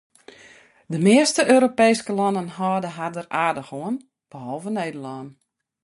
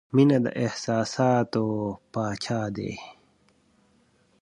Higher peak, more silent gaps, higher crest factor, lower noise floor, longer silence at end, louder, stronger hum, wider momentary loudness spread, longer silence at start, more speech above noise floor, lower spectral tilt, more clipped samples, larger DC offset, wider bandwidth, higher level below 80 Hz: first, -2 dBFS vs -8 dBFS; neither; about the same, 20 dB vs 18 dB; second, -51 dBFS vs -64 dBFS; second, 0.55 s vs 1.3 s; first, -21 LUFS vs -26 LUFS; neither; first, 17 LU vs 13 LU; first, 0.9 s vs 0.15 s; second, 30 dB vs 39 dB; second, -4.5 dB/octave vs -6.5 dB/octave; neither; neither; about the same, 11.5 kHz vs 10.5 kHz; second, -68 dBFS vs -60 dBFS